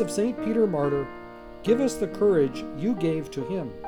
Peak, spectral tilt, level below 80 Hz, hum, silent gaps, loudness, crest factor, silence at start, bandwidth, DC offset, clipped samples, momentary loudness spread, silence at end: -10 dBFS; -6.5 dB/octave; -52 dBFS; none; none; -26 LUFS; 16 dB; 0 s; 17 kHz; under 0.1%; under 0.1%; 10 LU; 0 s